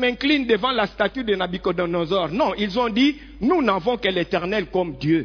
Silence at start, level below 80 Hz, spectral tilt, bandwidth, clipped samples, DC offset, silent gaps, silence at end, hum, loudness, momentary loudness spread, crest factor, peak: 0 s; -46 dBFS; -6.5 dB/octave; 5.4 kHz; under 0.1%; under 0.1%; none; 0 s; none; -21 LUFS; 5 LU; 16 dB; -4 dBFS